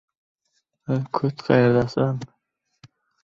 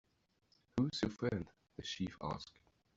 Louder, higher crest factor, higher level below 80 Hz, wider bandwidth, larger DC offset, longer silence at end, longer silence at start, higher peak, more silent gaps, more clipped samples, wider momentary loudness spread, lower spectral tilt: first, -22 LUFS vs -41 LUFS; about the same, 20 dB vs 22 dB; first, -56 dBFS vs -64 dBFS; about the same, 7.4 kHz vs 8 kHz; neither; first, 1 s vs 0.55 s; first, 0.9 s vs 0.75 s; first, -4 dBFS vs -22 dBFS; neither; neither; first, 17 LU vs 11 LU; first, -8.5 dB/octave vs -6 dB/octave